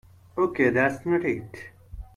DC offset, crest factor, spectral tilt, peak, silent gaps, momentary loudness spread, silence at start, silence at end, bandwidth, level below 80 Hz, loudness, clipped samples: under 0.1%; 18 dB; -7.5 dB/octave; -8 dBFS; none; 22 LU; 0.35 s; 0.1 s; 12 kHz; -50 dBFS; -24 LUFS; under 0.1%